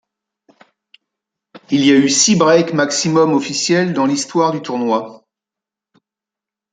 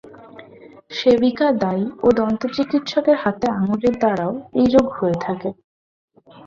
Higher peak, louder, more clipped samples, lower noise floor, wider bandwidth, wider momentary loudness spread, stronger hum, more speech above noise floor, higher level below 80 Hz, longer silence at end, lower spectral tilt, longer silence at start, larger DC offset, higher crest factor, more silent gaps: about the same, 0 dBFS vs -2 dBFS; first, -14 LUFS vs -19 LUFS; neither; first, -87 dBFS vs -44 dBFS; first, 9.4 kHz vs 7.4 kHz; about the same, 9 LU vs 8 LU; neither; first, 73 dB vs 26 dB; second, -62 dBFS vs -52 dBFS; first, 1.55 s vs 0.05 s; second, -4 dB/octave vs -7 dB/octave; first, 1.7 s vs 0.05 s; neither; about the same, 16 dB vs 18 dB; second, none vs 5.64-6.08 s